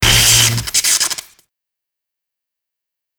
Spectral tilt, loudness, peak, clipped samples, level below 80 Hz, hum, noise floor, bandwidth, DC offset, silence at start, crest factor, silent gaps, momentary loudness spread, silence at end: -1 dB/octave; -11 LUFS; 0 dBFS; under 0.1%; -32 dBFS; none; -82 dBFS; over 20 kHz; under 0.1%; 0 s; 18 dB; none; 10 LU; 2 s